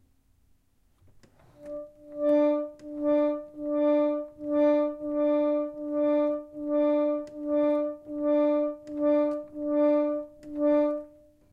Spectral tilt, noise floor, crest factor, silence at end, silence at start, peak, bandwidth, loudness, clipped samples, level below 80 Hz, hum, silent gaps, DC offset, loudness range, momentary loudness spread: -7.5 dB/octave; -65 dBFS; 14 dB; 0.45 s; 1.6 s; -14 dBFS; 5 kHz; -27 LUFS; under 0.1%; -66 dBFS; none; none; under 0.1%; 3 LU; 10 LU